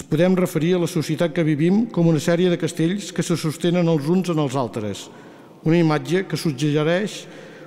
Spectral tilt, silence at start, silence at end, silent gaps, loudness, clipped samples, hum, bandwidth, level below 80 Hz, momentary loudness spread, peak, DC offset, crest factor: -6.5 dB/octave; 0 s; 0 s; none; -20 LUFS; under 0.1%; none; 15.5 kHz; -58 dBFS; 9 LU; -8 dBFS; under 0.1%; 14 dB